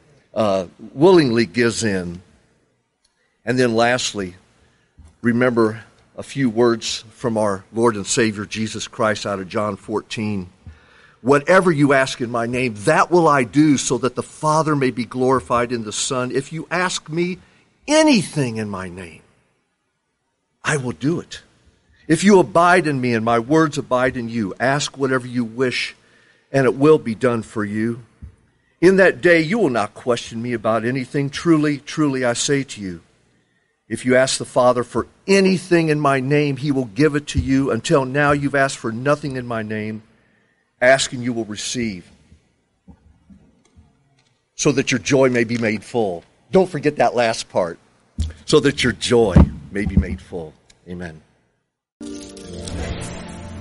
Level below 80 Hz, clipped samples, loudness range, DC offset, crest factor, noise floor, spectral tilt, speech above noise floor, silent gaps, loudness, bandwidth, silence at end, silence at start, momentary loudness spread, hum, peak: -38 dBFS; under 0.1%; 6 LU; under 0.1%; 18 dB; -71 dBFS; -5 dB/octave; 53 dB; 51.92-52.00 s; -18 LUFS; 11.5 kHz; 0 s; 0.35 s; 16 LU; none; -2 dBFS